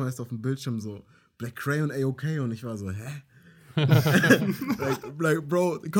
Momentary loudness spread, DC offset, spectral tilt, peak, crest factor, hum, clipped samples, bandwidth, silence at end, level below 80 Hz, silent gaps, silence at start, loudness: 18 LU; under 0.1%; -6 dB/octave; -4 dBFS; 22 dB; none; under 0.1%; 17 kHz; 0 s; -64 dBFS; none; 0 s; -26 LUFS